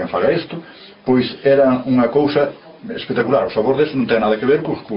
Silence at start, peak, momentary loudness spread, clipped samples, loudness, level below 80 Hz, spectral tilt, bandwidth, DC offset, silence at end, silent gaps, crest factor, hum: 0 s; -2 dBFS; 14 LU; under 0.1%; -16 LUFS; -52 dBFS; -5 dB/octave; 5.6 kHz; under 0.1%; 0 s; none; 14 dB; none